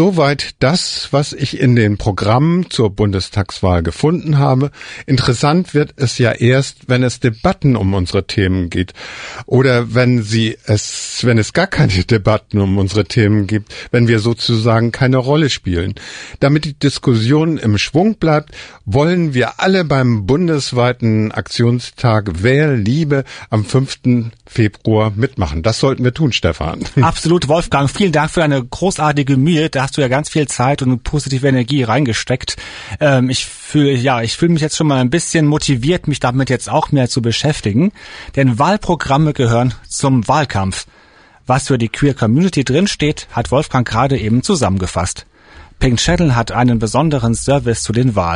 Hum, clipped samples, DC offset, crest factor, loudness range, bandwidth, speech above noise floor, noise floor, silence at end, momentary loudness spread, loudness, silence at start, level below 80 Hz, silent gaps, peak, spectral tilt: none; under 0.1%; under 0.1%; 12 dB; 2 LU; 10.5 kHz; 32 dB; -46 dBFS; 0 s; 6 LU; -15 LUFS; 0 s; -34 dBFS; none; -2 dBFS; -5.5 dB/octave